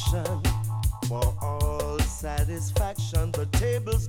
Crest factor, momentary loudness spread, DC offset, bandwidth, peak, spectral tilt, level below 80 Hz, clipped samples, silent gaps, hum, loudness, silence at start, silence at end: 14 dB; 2 LU; under 0.1%; 18.5 kHz; -12 dBFS; -5.5 dB/octave; -30 dBFS; under 0.1%; none; none; -28 LUFS; 0 s; 0 s